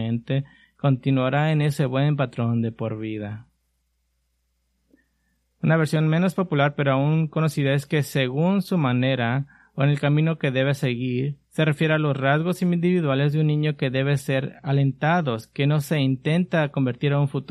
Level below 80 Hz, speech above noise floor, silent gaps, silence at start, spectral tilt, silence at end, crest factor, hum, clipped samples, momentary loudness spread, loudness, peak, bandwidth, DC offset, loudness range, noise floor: -62 dBFS; 49 dB; none; 0 s; -7.5 dB/octave; 0.05 s; 16 dB; none; under 0.1%; 7 LU; -23 LUFS; -6 dBFS; 13 kHz; under 0.1%; 5 LU; -71 dBFS